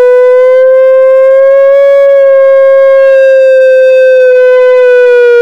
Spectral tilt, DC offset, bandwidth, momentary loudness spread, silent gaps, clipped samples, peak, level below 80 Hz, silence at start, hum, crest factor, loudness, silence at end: -1 dB/octave; under 0.1%; 5.8 kHz; 0 LU; none; under 0.1%; 0 dBFS; -56 dBFS; 0 s; none; 2 dB; -4 LUFS; 0 s